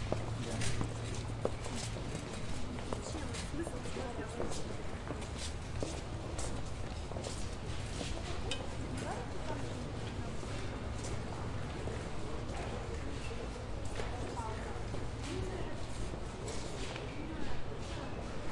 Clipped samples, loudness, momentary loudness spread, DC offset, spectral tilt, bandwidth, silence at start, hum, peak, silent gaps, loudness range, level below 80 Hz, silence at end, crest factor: under 0.1%; -41 LUFS; 3 LU; 0.2%; -5 dB/octave; 11.5 kHz; 0 s; none; -16 dBFS; none; 1 LU; -46 dBFS; 0 s; 22 dB